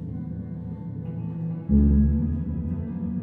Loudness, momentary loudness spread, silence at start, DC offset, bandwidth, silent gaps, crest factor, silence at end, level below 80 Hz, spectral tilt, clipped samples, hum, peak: -26 LUFS; 14 LU; 0 s; under 0.1%; 2.6 kHz; none; 16 dB; 0 s; -30 dBFS; -13.5 dB/octave; under 0.1%; none; -10 dBFS